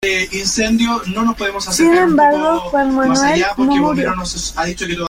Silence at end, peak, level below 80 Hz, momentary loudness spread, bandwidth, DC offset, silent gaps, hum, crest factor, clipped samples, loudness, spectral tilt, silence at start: 0 s; -2 dBFS; -38 dBFS; 9 LU; 16.5 kHz; under 0.1%; none; none; 14 dB; under 0.1%; -15 LUFS; -3.5 dB/octave; 0 s